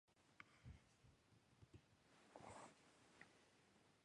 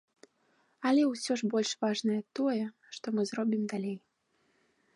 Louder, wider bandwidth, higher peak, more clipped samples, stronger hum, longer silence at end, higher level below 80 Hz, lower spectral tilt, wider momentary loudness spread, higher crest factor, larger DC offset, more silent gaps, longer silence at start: second, -66 LUFS vs -32 LUFS; about the same, 11 kHz vs 11.5 kHz; second, -40 dBFS vs -16 dBFS; neither; neither; second, 0 s vs 0.95 s; first, -78 dBFS vs -84 dBFS; about the same, -4.5 dB/octave vs -4.5 dB/octave; second, 7 LU vs 11 LU; first, 28 dB vs 16 dB; neither; neither; second, 0.05 s vs 0.8 s